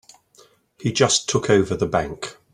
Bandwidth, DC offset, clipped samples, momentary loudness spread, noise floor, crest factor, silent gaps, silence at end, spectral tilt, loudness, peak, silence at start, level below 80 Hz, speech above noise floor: 11.5 kHz; under 0.1%; under 0.1%; 12 LU; -55 dBFS; 20 dB; none; 0.2 s; -4 dB/octave; -20 LUFS; -2 dBFS; 0.8 s; -50 dBFS; 35 dB